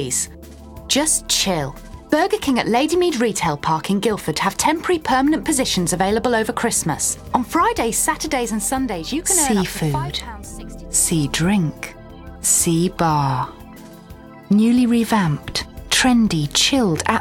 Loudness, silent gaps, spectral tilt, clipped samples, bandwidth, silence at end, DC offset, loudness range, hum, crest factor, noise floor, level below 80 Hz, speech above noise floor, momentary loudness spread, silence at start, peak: -18 LUFS; none; -3.5 dB/octave; under 0.1%; 17.5 kHz; 0 s; under 0.1%; 2 LU; none; 18 dB; -40 dBFS; -40 dBFS; 21 dB; 10 LU; 0 s; -2 dBFS